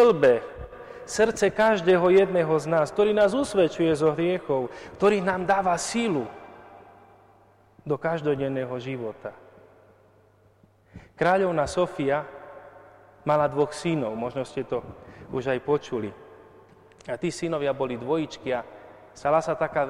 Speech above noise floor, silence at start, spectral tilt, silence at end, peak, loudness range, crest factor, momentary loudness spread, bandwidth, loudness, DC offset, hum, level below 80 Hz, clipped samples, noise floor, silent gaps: 35 dB; 0 s; -5.5 dB/octave; 0 s; -10 dBFS; 10 LU; 16 dB; 17 LU; 12.5 kHz; -25 LUFS; under 0.1%; none; -56 dBFS; under 0.1%; -59 dBFS; none